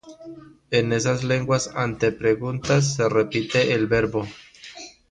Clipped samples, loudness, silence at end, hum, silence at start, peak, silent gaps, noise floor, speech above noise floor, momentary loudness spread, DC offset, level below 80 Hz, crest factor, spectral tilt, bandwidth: under 0.1%; -22 LUFS; 0.2 s; none; 0.05 s; -8 dBFS; none; -42 dBFS; 20 dB; 20 LU; under 0.1%; -50 dBFS; 16 dB; -5 dB/octave; 10 kHz